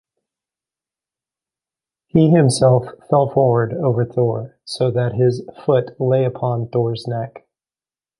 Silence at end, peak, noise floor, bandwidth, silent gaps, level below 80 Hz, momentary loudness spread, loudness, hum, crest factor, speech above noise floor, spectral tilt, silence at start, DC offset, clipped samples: 0.8 s; -2 dBFS; under -90 dBFS; 11.5 kHz; none; -54 dBFS; 11 LU; -18 LUFS; none; 18 dB; over 73 dB; -7 dB/octave; 2.15 s; under 0.1%; under 0.1%